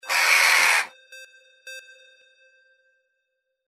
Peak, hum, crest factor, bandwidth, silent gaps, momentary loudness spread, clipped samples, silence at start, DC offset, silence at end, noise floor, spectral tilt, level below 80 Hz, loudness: -4 dBFS; none; 20 dB; 16 kHz; none; 25 LU; under 0.1%; 0.05 s; under 0.1%; 1.9 s; -78 dBFS; 3.5 dB/octave; -88 dBFS; -17 LUFS